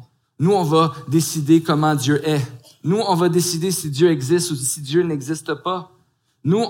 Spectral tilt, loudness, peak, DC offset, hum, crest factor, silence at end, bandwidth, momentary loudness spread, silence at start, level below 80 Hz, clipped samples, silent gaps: -5.5 dB/octave; -19 LUFS; -4 dBFS; under 0.1%; none; 16 dB; 0 s; 17 kHz; 9 LU; 0 s; -62 dBFS; under 0.1%; none